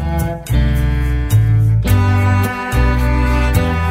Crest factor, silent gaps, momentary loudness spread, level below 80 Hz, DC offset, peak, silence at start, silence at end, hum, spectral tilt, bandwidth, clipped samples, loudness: 12 dB; none; 5 LU; -18 dBFS; under 0.1%; 0 dBFS; 0 s; 0 s; none; -7 dB/octave; 16 kHz; under 0.1%; -15 LUFS